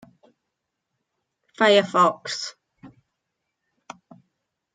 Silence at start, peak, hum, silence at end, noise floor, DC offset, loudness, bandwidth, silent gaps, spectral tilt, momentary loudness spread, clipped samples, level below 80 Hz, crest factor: 1.6 s; -4 dBFS; none; 1.85 s; -81 dBFS; under 0.1%; -20 LUFS; 9.4 kHz; none; -3.5 dB/octave; 14 LU; under 0.1%; -76 dBFS; 22 dB